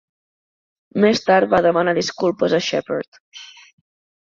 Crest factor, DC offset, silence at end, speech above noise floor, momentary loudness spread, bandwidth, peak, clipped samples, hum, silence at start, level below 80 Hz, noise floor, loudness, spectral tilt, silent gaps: 18 dB; under 0.1%; 0.8 s; over 72 dB; 22 LU; 7.6 kHz; -2 dBFS; under 0.1%; none; 0.95 s; -58 dBFS; under -90 dBFS; -18 LUFS; -5 dB/octave; 3.08-3.12 s, 3.20-3.32 s